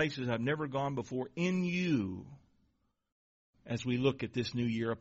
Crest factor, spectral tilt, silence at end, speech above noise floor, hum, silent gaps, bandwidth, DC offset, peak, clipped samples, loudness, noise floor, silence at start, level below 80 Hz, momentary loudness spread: 18 dB; -5.5 dB/octave; 0 s; 43 dB; none; 3.12-3.53 s; 7.6 kHz; under 0.1%; -16 dBFS; under 0.1%; -34 LUFS; -77 dBFS; 0 s; -66 dBFS; 8 LU